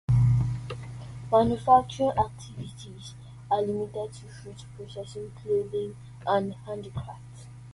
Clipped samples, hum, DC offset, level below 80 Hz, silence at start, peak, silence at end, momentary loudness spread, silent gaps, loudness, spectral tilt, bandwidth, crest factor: under 0.1%; none; under 0.1%; -48 dBFS; 0.1 s; -8 dBFS; 0 s; 22 LU; none; -27 LUFS; -7.5 dB/octave; 11.5 kHz; 20 dB